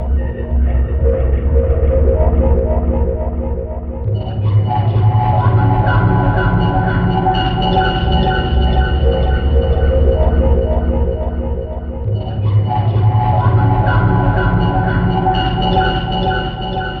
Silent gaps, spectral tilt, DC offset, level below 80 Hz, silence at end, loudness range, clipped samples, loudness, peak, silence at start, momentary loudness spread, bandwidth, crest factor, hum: none; -9.5 dB/octave; under 0.1%; -18 dBFS; 0 s; 2 LU; under 0.1%; -15 LUFS; -2 dBFS; 0 s; 7 LU; 4.8 kHz; 12 dB; none